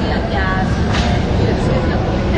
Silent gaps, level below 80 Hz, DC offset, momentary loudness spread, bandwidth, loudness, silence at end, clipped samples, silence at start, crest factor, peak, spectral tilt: none; -22 dBFS; under 0.1%; 2 LU; 9 kHz; -16 LUFS; 0 s; under 0.1%; 0 s; 12 dB; -2 dBFS; -7 dB/octave